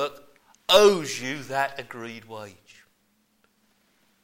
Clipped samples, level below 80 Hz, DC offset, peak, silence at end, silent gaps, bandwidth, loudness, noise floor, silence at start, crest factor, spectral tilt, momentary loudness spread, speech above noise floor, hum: under 0.1%; -62 dBFS; under 0.1%; -6 dBFS; 1.75 s; none; 16.5 kHz; -22 LUFS; -68 dBFS; 0 s; 22 dB; -3 dB/octave; 24 LU; 44 dB; none